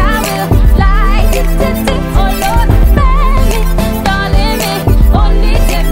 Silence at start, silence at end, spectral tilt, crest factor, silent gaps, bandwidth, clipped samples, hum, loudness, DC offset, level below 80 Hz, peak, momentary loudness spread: 0 s; 0 s; -5.5 dB/octave; 8 dB; none; 16.5 kHz; 0.4%; none; -11 LUFS; under 0.1%; -10 dBFS; 0 dBFS; 4 LU